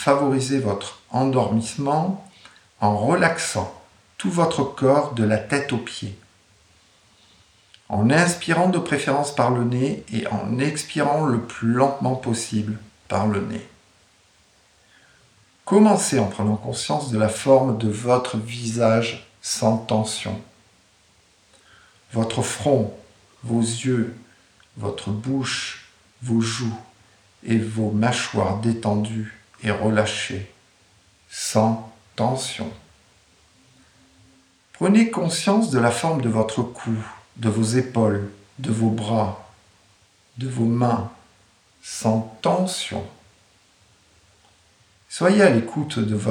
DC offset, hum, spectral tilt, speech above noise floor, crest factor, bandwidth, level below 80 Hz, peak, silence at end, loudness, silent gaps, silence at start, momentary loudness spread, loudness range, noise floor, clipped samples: under 0.1%; none; -5.5 dB/octave; 37 dB; 20 dB; 16 kHz; -60 dBFS; -2 dBFS; 0 s; -22 LUFS; none; 0 s; 13 LU; 6 LU; -58 dBFS; under 0.1%